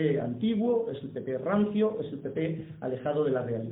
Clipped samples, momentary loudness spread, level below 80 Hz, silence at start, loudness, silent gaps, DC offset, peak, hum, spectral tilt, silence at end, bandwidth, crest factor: under 0.1%; 8 LU; -66 dBFS; 0 s; -30 LUFS; none; under 0.1%; -14 dBFS; none; -11.5 dB/octave; 0 s; 4 kHz; 14 dB